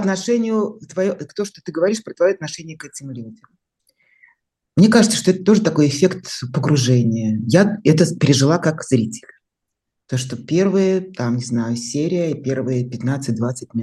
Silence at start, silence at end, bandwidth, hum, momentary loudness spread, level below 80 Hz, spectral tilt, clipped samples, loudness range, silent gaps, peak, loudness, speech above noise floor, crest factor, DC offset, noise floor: 0 s; 0 s; 12.5 kHz; none; 12 LU; -58 dBFS; -6 dB/octave; under 0.1%; 7 LU; none; 0 dBFS; -18 LUFS; 62 dB; 18 dB; under 0.1%; -80 dBFS